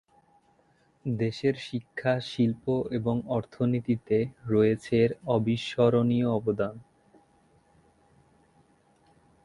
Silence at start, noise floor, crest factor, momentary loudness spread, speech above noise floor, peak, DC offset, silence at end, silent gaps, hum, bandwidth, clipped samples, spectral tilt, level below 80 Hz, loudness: 1.05 s; -65 dBFS; 20 dB; 7 LU; 39 dB; -10 dBFS; under 0.1%; 2.6 s; none; none; 11 kHz; under 0.1%; -8 dB/octave; -60 dBFS; -28 LUFS